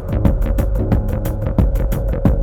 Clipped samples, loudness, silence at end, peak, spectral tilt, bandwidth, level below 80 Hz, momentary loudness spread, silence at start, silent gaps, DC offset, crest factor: under 0.1%; -19 LUFS; 0 s; 0 dBFS; -9 dB/octave; 17 kHz; -18 dBFS; 3 LU; 0 s; none; under 0.1%; 14 dB